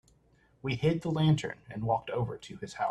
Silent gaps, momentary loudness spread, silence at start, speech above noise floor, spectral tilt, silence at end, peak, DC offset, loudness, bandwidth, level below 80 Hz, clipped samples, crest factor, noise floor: none; 13 LU; 0.65 s; 35 dB; -7 dB/octave; 0 s; -14 dBFS; under 0.1%; -31 LUFS; 9 kHz; -60 dBFS; under 0.1%; 16 dB; -66 dBFS